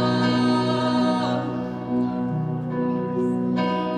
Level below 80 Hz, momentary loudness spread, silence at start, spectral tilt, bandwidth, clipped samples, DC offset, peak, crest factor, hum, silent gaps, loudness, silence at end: -58 dBFS; 6 LU; 0 s; -7 dB/octave; 9.6 kHz; under 0.1%; under 0.1%; -10 dBFS; 12 dB; none; none; -23 LUFS; 0 s